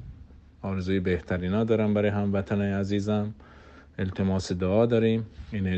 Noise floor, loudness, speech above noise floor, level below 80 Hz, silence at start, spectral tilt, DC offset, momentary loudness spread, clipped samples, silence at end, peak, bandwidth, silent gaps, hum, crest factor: -49 dBFS; -27 LUFS; 24 dB; -52 dBFS; 0 s; -7.5 dB/octave; under 0.1%; 13 LU; under 0.1%; 0 s; -10 dBFS; 8.4 kHz; none; none; 16 dB